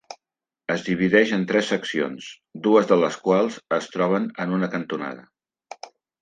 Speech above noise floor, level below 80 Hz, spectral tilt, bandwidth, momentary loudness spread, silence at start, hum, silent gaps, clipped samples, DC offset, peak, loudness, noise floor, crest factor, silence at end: 67 dB; -68 dBFS; -6 dB/octave; 9.4 kHz; 19 LU; 0.1 s; none; none; under 0.1%; under 0.1%; -2 dBFS; -22 LUFS; -89 dBFS; 20 dB; 0.35 s